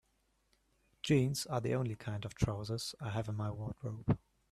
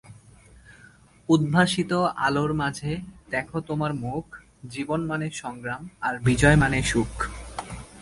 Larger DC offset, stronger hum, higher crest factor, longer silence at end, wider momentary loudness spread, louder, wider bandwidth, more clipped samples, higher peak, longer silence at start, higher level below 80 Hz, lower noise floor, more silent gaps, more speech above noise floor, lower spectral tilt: neither; neither; about the same, 20 dB vs 20 dB; first, 0.35 s vs 0 s; second, 10 LU vs 17 LU; second, -37 LUFS vs -25 LUFS; first, 13.5 kHz vs 11.5 kHz; neither; second, -18 dBFS vs -6 dBFS; first, 1.05 s vs 0.05 s; second, -56 dBFS vs -42 dBFS; first, -77 dBFS vs -53 dBFS; neither; first, 41 dB vs 29 dB; about the same, -6 dB/octave vs -5.5 dB/octave